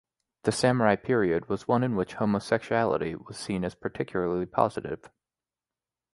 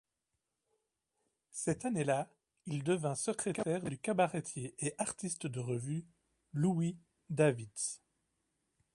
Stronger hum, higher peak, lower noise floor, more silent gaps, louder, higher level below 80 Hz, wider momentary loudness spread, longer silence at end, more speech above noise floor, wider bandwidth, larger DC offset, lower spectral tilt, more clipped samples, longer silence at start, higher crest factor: neither; first, -6 dBFS vs -16 dBFS; about the same, under -90 dBFS vs -87 dBFS; neither; first, -28 LUFS vs -36 LUFS; first, -58 dBFS vs -74 dBFS; about the same, 10 LU vs 11 LU; first, 1.2 s vs 1 s; first, over 63 dB vs 52 dB; about the same, 11.5 kHz vs 11.5 kHz; neither; about the same, -6 dB/octave vs -5.5 dB/octave; neither; second, 0.45 s vs 1.55 s; about the same, 22 dB vs 22 dB